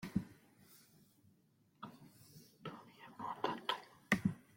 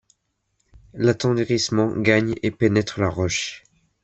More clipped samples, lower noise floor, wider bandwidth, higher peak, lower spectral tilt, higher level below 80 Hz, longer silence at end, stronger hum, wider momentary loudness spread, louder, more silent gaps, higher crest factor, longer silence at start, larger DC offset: neither; about the same, -73 dBFS vs -72 dBFS; first, 16.5 kHz vs 8.4 kHz; second, -18 dBFS vs -2 dBFS; about the same, -5.5 dB/octave vs -5 dB/octave; second, -72 dBFS vs -52 dBFS; second, 0.15 s vs 0.45 s; neither; first, 25 LU vs 6 LU; second, -42 LUFS vs -21 LUFS; neither; first, 28 dB vs 20 dB; second, 0 s vs 0.95 s; neither